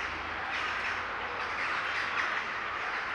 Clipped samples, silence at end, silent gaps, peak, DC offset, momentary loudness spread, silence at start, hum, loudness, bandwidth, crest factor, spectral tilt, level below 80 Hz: under 0.1%; 0 s; none; -16 dBFS; under 0.1%; 4 LU; 0 s; none; -32 LUFS; 12 kHz; 18 dB; -2.5 dB/octave; -60 dBFS